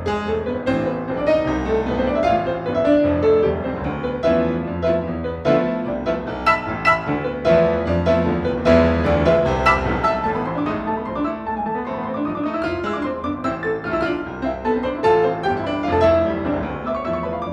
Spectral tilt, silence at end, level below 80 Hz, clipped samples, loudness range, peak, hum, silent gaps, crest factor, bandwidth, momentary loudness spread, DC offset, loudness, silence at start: -7.5 dB/octave; 0 s; -36 dBFS; under 0.1%; 6 LU; -2 dBFS; none; none; 18 dB; 9.4 kHz; 8 LU; under 0.1%; -20 LUFS; 0 s